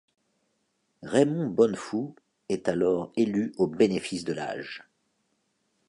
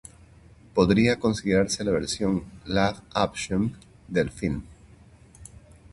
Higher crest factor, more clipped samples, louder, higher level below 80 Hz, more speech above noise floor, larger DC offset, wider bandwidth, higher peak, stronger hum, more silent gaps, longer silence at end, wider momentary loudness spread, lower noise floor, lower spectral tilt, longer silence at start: about the same, 20 dB vs 20 dB; neither; about the same, -27 LUFS vs -25 LUFS; second, -66 dBFS vs -46 dBFS; first, 48 dB vs 27 dB; neither; about the same, 11 kHz vs 11.5 kHz; about the same, -8 dBFS vs -6 dBFS; neither; neither; first, 1.1 s vs 0.45 s; first, 13 LU vs 10 LU; first, -75 dBFS vs -52 dBFS; about the same, -6 dB/octave vs -5.5 dB/octave; first, 1 s vs 0.75 s